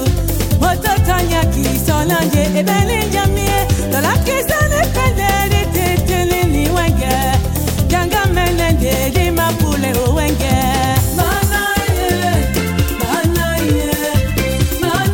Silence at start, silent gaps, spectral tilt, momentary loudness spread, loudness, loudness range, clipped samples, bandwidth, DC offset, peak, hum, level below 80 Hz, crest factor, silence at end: 0 s; none; -5 dB/octave; 2 LU; -15 LUFS; 1 LU; under 0.1%; 17 kHz; under 0.1%; 0 dBFS; none; -22 dBFS; 14 dB; 0 s